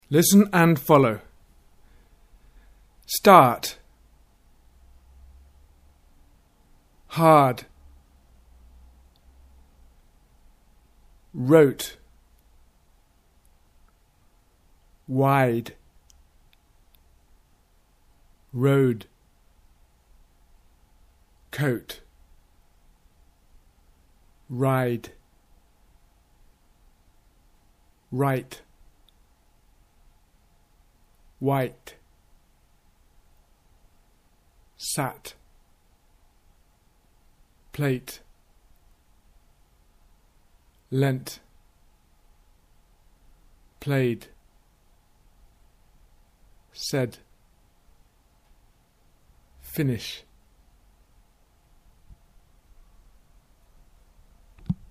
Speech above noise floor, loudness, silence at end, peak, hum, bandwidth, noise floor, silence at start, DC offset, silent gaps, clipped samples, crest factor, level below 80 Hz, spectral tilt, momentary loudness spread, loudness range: 40 dB; -22 LUFS; 0.15 s; 0 dBFS; none; 15.5 kHz; -61 dBFS; 0.1 s; under 0.1%; none; under 0.1%; 28 dB; -56 dBFS; -5.5 dB/octave; 26 LU; 14 LU